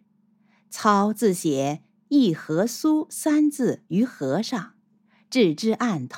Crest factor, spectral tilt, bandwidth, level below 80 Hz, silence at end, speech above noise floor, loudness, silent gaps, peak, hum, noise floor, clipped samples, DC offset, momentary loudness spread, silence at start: 18 dB; -5.5 dB/octave; 17 kHz; -80 dBFS; 0 s; 41 dB; -23 LUFS; none; -4 dBFS; none; -63 dBFS; under 0.1%; under 0.1%; 8 LU; 0.7 s